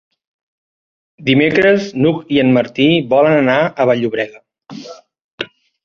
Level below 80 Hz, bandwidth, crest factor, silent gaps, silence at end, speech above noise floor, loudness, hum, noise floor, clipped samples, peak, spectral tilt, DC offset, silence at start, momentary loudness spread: -54 dBFS; 7 kHz; 14 dB; 5.24-5.38 s; 0.4 s; 21 dB; -13 LUFS; none; -34 dBFS; under 0.1%; -2 dBFS; -7 dB/octave; under 0.1%; 1.2 s; 16 LU